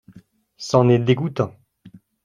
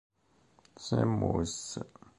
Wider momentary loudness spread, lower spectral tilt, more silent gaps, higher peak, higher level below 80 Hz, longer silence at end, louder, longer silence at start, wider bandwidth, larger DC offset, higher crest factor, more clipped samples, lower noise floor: about the same, 11 LU vs 13 LU; about the same, -7 dB/octave vs -6 dB/octave; neither; first, -2 dBFS vs -14 dBFS; about the same, -56 dBFS vs -52 dBFS; about the same, 0.35 s vs 0.3 s; first, -19 LUFS vs -32 LUFS; second, 0.15 s vs 0.8 s; second, 9.8 kHz vs 11.5 kHz; neither; about the same, 20 dB vs 20 dB; neither; second, -50 dBFS vs -67 dBFS